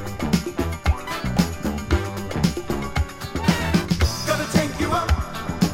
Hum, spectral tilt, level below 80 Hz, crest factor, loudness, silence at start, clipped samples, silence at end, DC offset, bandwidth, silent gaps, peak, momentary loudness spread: none; -5.5 dB/octave; -30 dBFS; 20 dB; -23 LUFS; 0 s; under 0.1%; 0 s; under 0.1%; 16 kHz; none; -4 dBFS; 6 LU